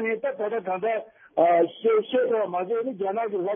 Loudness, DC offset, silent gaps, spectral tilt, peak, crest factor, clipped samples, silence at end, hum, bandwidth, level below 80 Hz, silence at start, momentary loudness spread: -25 LUFS; under 0.1%; none; -9.5 dB/octave; -8 dBFS; 16 dB; under 0.1%; 0 s; none; 3.7 kHz; -78 dBFS; 0 s; 8 LU